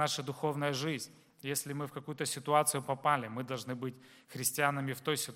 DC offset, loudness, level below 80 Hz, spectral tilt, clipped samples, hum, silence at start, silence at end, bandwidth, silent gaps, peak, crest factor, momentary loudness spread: under 0.1%; -34 LUFS; -80 dBFS; -3.5 dB/octave; under 0.1%; none; 0 s; 0 s; 16.5 kHz; none; -14 dBFS; 22 dB; 11 LU